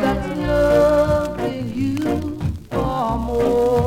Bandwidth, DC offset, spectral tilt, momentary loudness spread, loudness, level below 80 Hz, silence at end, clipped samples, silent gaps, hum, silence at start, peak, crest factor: 16.5 kHz; under 0.1%; -7 dB/octave; 10 LU; -20 LUFS; -32 dBFS; 0 s; under 0.1%; none; none; 0 s; -6 dBFS; 12 dB